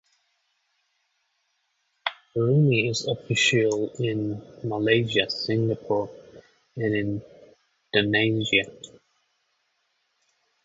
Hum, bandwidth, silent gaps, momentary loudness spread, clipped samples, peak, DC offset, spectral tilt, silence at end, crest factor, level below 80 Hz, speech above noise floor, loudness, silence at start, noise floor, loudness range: none; 8 kHz; none; 13 LU; under 0.1%; -6 dBFS; under 0.1%; -5 dB/octave; 1.8 s; 22 dB; -62 dBFS; 49 dB; -24 LUFS; 2.05 s; -73 dBFS; 4 LU